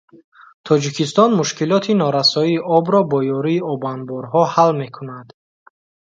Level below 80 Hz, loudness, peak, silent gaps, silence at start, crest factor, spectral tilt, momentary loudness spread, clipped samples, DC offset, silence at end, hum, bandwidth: -66 dBFS; -17 LUFS; 0 dBFS; none; 0.65 s; 18 dB; -5.5 dB/octave; 12 LU; under 0.1%; under 0.1%; 0.9 s; none; 9.2 kHz